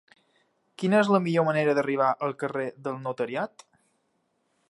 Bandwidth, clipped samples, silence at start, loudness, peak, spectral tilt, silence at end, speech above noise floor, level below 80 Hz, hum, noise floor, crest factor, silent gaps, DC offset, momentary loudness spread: 11.5 kHz; under 0.1%; 0.8 s; -26 LUFS; -8 dBFS; -7 dB/octave; 1.25 s; 48 dB; -78 dBFS; none; -73 dBFS; 20 dB; none; under 0.1%; 11 LU